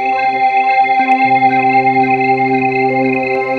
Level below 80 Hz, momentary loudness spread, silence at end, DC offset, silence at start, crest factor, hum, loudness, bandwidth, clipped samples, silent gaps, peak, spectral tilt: -58 dBFS; 3 LU; 0 s; under 0.1%; 0 s; 12 dB; none; -12 LUFS; 6.2 kHz; under 0.1%; none; 0 dBFS; -7 dB/octave